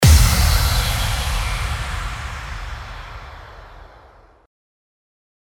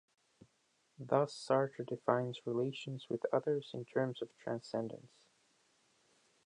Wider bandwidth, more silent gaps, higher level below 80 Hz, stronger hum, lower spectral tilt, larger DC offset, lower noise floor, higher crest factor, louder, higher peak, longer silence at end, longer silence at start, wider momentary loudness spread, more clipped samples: first, 17.5 kHz vs 10.5 kHz; neither; first, -22 dBFS vs -86 dBFS; neither; second, -3.5 dB/octave vs -6.5 dB/octave; neither; second, -48 dBFS vs -77 dBFS; second, 18 dB vs 24 dB; first, -20 LUFS vs -38 LUFS; first, -2 dBFS vs -16 dBFS; first, 1.6 s vs 1.4 s; second, 0 s vs 1 s; first, 22 LU vs 10 LU; neither